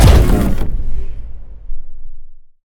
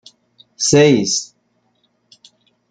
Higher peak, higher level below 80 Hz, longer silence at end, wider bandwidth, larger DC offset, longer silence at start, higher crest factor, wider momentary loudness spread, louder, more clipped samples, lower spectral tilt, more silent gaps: about the same, 0 dBFS vs -2 dBFS; first, -16 dBFS vs -54 dBFS; second, 0.15 s vs 1.45 s; first, 17.5 kHz vs 9.6 kHz; neither; second, 0 s vs 0.6 s; second, 12 dB vs 18 dB; first, 24 LU vs 11 LU; about the same, -16 LUFS vs -14 LUFS; first, 0.3% vs under 0.1%; first, -6.5 dB/octave vs -4 dB/octave; neither